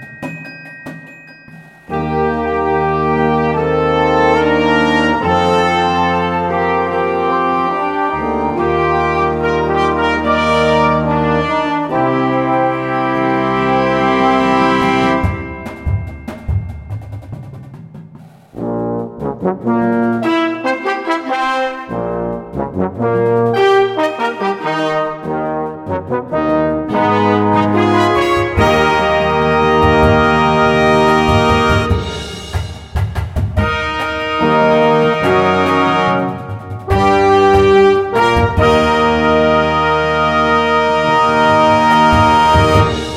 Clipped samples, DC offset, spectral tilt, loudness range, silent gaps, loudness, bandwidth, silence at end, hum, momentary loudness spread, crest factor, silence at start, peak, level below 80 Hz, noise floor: under 0.1%; under 0.1%; -6.5 dB/octave; 6 LU; none; -14 LUFS; 14 kHz; 0 s; none; 12 LU; 14 dB; 0 s; 0 dBFS; -32 dBFS; -38 dBFS